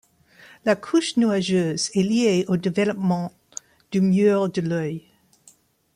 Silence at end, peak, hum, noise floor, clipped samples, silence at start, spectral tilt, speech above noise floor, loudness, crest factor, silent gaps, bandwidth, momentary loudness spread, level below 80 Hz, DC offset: 0.95 s; -8 dBFS; none; -56 dBFS; under 0.1%; 0.65 s; -5.5 dB/octave; 36 dB; -22 LUFS; 14 dB; none; 11 kHz; 13 LU; -64 dBFS; under 0.1%